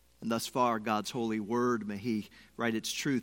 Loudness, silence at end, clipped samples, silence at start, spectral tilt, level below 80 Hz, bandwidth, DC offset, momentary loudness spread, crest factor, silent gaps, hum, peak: -33 LUFS; 0 s; under 0.1%; 0.2 s; -4.5 dB/octave; -70 dBFS; 16.5 kHz; under 0.1%; 6 LU; 18 dB; none; none; -14 dBFS